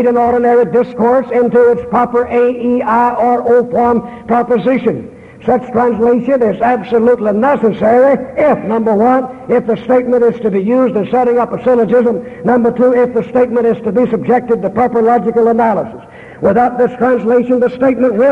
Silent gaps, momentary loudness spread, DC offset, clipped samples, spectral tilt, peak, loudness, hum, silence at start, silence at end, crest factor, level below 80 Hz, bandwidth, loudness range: none; 5 LU; under 0.1%; under 0.1%; -9 dB/octave; -2 dBFS; -12 LUFS; none; 0 s; 0 s; 10 dB; -46 dBFS; 4.4 kHz; 1 LU